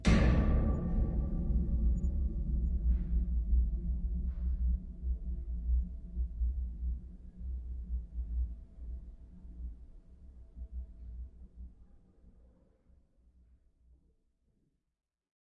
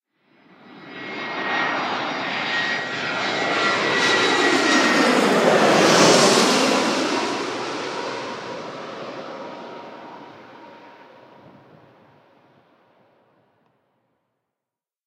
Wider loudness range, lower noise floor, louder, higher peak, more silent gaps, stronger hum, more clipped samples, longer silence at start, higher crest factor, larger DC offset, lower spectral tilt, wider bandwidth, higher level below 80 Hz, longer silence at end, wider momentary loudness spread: about the same, 19 LU vs 20 LU; second, -77 dBFS vs -88 dBFS; second, -36 LUFS vs -19 LUFS; second, -14 dBFS vs -2 dBFS; neither; neither; neither; second, 0 s vs 0.7 s; about the same, 20 dB vs 20 dB; neither; first, -7.5 dB/octave vs -3 dB/octave; second, 8.2 kHz vs 16 kHz; first, -36 dBFS vs -76 dBFS; second, 3.5 s vs 4.15 s; about the same, 19 LU vs 21 LU